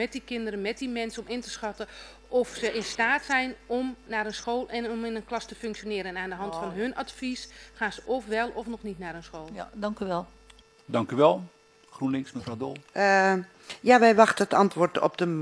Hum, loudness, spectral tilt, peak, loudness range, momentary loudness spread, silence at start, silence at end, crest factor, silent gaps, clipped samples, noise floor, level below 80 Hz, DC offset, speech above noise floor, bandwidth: none; -27 LUFS; -5 dB/octave; -2 dBFS; 10 LU; 16 LU; 0 s; 0 s; 24 dB; none; under 0.1%; -55 dBFS; -58 dBFS; under 0.1%; 28 dB; 11 kHz